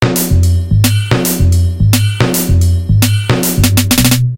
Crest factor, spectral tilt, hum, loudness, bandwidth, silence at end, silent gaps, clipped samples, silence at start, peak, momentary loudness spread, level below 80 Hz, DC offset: 10 dB; -5 dB/octave; none; -11 LUFS; 17.5 kHz; 0 s; none; 0.2%; 0 s; 0 dBFS; 3 LU; -22 dBFS; under 0.1%